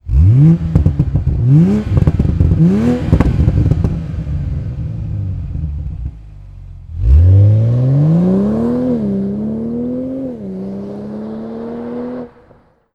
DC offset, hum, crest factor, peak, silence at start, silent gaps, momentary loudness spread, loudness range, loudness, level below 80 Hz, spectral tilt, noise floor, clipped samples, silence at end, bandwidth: under 0.1%; none; 14 dB; 0 dBFS; 0.05 s; none; 15 LU; 10 LU; -14 LUFS; -22 dBFS; -10.5 dB/octave; -48 dBFS; under 0.1%; 0.65 s; 5.6 kHz